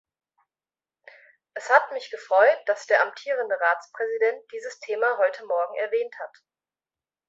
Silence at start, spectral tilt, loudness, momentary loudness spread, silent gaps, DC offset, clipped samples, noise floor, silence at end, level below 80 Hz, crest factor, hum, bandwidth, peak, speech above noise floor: 1.55 s; -0.5 dB/octave; -24 LUFS; 16 LU; none; under 0.1%; under 0.1%; under -90 dBFS; 1 s; -84 dBFS; 22 dB; none; 7.8 kHz; -2 dBFS; over 66 dB